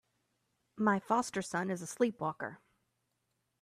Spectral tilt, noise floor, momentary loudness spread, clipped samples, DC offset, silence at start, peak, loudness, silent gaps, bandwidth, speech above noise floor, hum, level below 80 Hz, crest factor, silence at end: -5 dB/octave; -82 dBFS; 7 LU; under 0.1%; under 0.1%; 0.75 s; -16 dBFS; -35 LUFS; none; 14.5 kHz; 48 dB; none; -78 dBFS; 20 dB; 1.05 s